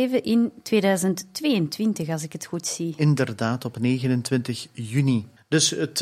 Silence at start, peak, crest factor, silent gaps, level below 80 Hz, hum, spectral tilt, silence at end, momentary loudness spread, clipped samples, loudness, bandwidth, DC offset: 0 s; -6 dBFS; 18 dB; none; -66 dBFS; none; -5 dB/octave; 0 s; 8 LU; under 0.1%; -24 LUFS; 15.5 kHz; under 0.1%